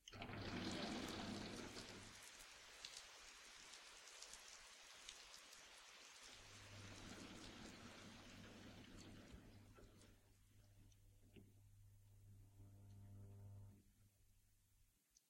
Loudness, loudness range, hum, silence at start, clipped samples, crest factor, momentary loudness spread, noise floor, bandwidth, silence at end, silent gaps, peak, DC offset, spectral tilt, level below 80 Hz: -56 LUFS; 14 LU; none; 0 s; under 0.1%; 26 dB; 17 LU; -78 dBFS; 16 kHz; 0.1 s; none; -32 dBFS; under 0.1%; -3.5 dB/octave; -72 dBFS